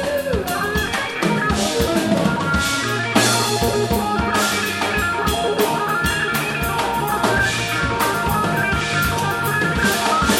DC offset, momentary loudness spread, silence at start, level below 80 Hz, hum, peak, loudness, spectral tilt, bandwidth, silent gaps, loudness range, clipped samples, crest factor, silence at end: under 0.1%; 3 LU; 0 s; -34 dBFS; none; 0 dBFS; -19 LUFS; -4 dB/octave; 17 kHz; none; 1 LU; under 0.1%; 18 dB; 0 s